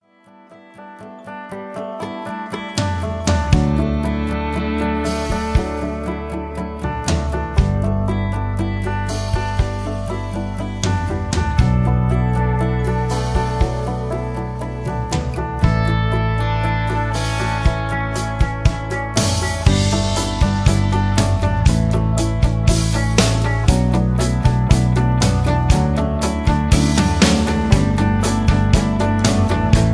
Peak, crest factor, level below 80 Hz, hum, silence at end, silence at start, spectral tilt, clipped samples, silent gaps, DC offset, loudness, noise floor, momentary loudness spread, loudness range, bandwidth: 0 dBFS; 18 dB; -24 dBFS; none; 0 s; 0.5 s; -6 dB/octave; under 0.1%; none; under 0.1%; -19 LUFS; -48 dBFS; 9 LU; 5 LU; 11 kHz